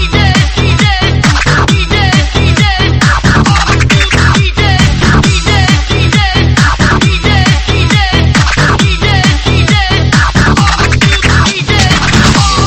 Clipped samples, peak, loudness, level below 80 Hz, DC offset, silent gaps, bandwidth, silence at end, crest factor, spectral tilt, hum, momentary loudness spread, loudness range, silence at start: 1%; 0 dBFS; -8 LUFS; -14 dBFS; under 0.1%; none; 10.5 kHz; 0 s; 8 dB; -4.5 dB/octave; none; 2 LU; 0 LU; 0 s